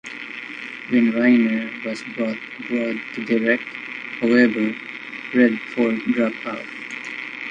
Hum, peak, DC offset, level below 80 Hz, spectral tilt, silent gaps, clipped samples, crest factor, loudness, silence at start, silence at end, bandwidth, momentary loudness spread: none; -2 dBFS; under 0.1%; -68 dBFS; -6 dB/octave; none; under 0.1%; 20 dB; -22 LUFS; 0.05 s; 0 s; 7.8 kHz; 15 LU